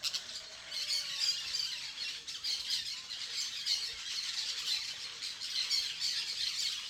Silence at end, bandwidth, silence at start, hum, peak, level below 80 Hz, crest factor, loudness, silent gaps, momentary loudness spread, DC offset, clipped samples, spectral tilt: 0 s; 19.5 kHz; 0 s; none; -18 dBFS; -74 dBFS; 20 dB; -34 LUFS; none; 8 LU; under 0.1%; under 0.1%; 2.5 dB/octave